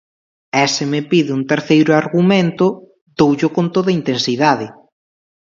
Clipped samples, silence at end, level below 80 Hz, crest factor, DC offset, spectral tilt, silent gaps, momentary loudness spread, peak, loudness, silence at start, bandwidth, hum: under 0.1%; 0.8 s; -58 dBFS; 16 dB; under 0.1%; -5.5 dB/octave; 3.01-3.06 s; 6 LU; 0 dBFS; -15 LUFS; 0.55 s; 7.6 kHz; none